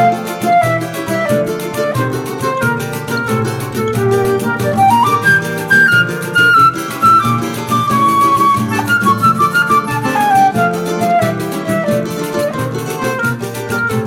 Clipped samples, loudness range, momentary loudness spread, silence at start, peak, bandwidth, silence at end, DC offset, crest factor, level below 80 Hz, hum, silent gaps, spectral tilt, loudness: under 0.1%; 6 LU; 9 LU; 0 s; -2 dBFS; 16.5 kHz; 0 s; under 0.1%; 12 dB; -46 dBFS; none; none; -5 dB/octave; -13 LUFS